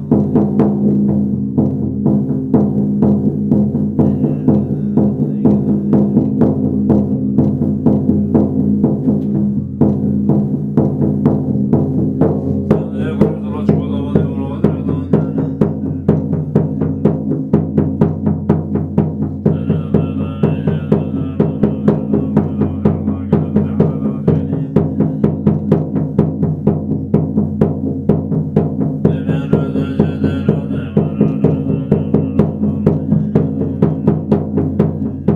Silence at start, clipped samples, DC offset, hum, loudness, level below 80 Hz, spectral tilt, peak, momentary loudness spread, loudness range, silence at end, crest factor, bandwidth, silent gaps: 0 s; under 0.1%; under 0.1%; none; -15 LUFS; -40 dBFS; -11.5 dB/octave; 0 dBFS; 3 LU; 2 LU; 0 s; 14 dB; 3.8 kHz; none